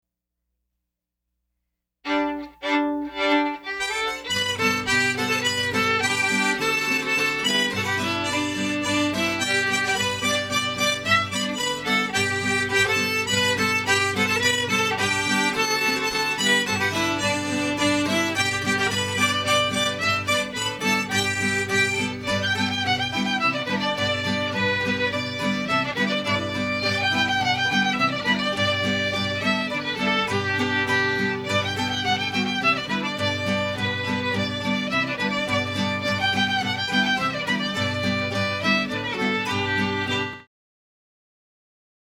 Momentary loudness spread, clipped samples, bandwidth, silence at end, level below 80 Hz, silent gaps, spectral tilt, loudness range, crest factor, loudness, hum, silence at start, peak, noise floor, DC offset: 5 LU; under 0.1%; 19 kHz; 1.75 s; -56 dBFS; none; -3 dB/octave; 3 LU; 18 dB; -22 LUFS; 60 Hz at -60 dBFS; 2.05 s; -6 dBFS; -82 dBFS; under 0.1%